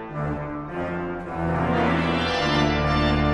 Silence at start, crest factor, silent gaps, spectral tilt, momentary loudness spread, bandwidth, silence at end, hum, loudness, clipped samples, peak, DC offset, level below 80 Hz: 0 s; 16 dB; none; -6.5 dB/octave; 9 LU; 10.5 kHz; 0 s; none; -24 LUFS; under 0.1%; -8 dBFS; under 0.1%; -34 dBFS